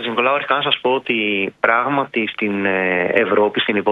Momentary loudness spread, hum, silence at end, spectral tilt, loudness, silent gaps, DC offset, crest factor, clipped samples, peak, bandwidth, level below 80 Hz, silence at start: 4 LU; none; 0 s; -6.5 dB/octave; -17 LUFS; none; under 0.1%; 18 dB; under 0.1%; 0 dBFS; 5.2 kHz; -64 dBFS; 0 s